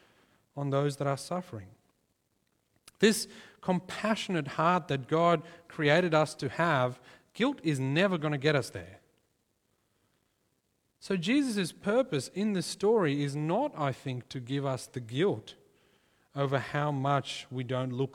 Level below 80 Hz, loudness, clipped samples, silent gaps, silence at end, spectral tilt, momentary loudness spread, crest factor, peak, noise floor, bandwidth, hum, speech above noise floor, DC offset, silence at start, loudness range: -70 dBFS; -30 LUFS; under 0.1%; none; 0.05 s; -5.5 dB/octave; 12 LU; 22 dB; -10 dBFS; -76 dBFS; 16 kHz; none; 46 dB; under 0.1%; 0.55 s; 6 LU